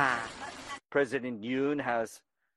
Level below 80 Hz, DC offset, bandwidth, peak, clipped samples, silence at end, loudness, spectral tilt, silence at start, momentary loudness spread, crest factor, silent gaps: -68 dBFS; under 0.1%; 12.5 kHz; -12 dBFS; under 0.1%; 0.4 s; -33 LUFS; -4.5 dB/octave; 0 s; 11 LU; 22 dB; none